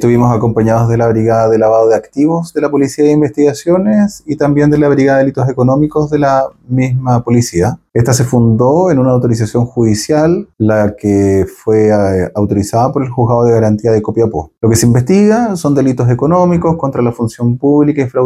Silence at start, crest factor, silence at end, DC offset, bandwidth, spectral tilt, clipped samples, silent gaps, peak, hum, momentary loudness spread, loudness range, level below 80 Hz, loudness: 0 s; 10 dB; 0 s; under 0.1%; 14.5 kHz; -7 dB/octave; under 0.1%; none; 0 dBFS; none; 5 LU; 1 LU; -40 dBFS; -11 LUFS